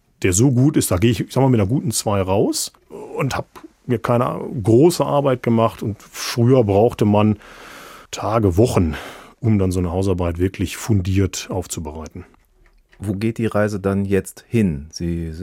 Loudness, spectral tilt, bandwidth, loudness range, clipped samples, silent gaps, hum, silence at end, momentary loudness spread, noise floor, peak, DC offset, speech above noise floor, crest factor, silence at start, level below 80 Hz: -19 LUFS; -6 dB/octave; 16.5 kHz; 6 LU; under 0.1%; none; none; 0 s; 13 LU; -54 dBFS; -2 dBFS; under 0.1%; 36 dB; 18 dB; 0.2 s; -44 dBFS